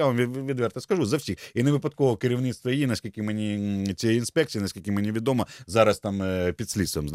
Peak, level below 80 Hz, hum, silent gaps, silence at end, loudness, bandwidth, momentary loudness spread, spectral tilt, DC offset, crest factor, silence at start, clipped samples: -6 dBFS; -52 dBFS; none; none; 0 s; -26 LUFS; 16 kHz; 6 LU; -6 dB/octave; under 0.1%; 20 dB; 0 s; under 0.1%